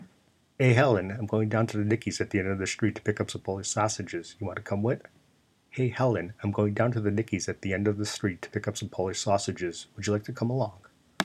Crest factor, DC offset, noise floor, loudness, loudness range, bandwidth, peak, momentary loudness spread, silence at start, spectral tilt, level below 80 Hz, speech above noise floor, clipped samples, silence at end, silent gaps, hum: 22 dB; under 0.1%; -66 dBFS; -29 LUFS; 4 LU; 13.5 kHz; -6 dBFS; 8 LU; 0 s; -5.5 dB/octave; -64 dBFS; 37 dB; under 0.1%; 0 s; none; none